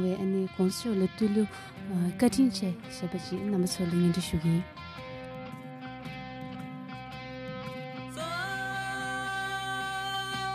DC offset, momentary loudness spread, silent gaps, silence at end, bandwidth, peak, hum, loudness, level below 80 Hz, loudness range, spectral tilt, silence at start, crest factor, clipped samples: under 0.1%; 14 LU; none; 0 s; 15 kHz; -12 dBFS; none; -32 LUFS; -56 dBFS; 11 LU; -5.5 dB/octave; 0 s; 18 dB; under 0.1%